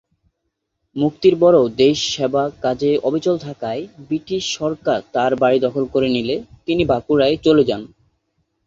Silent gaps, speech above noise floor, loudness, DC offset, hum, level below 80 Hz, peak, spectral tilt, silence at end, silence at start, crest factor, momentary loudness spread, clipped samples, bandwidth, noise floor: none; 58 dB; -18 LUFS; under 0.1%; none; -50 dBFS; -2 dBFS; -5.5 dB/octave; 0.8 s; 0.95 s; 16 dB; 12 LU; under 0.1%; 7.8 kHz; -75 dBFS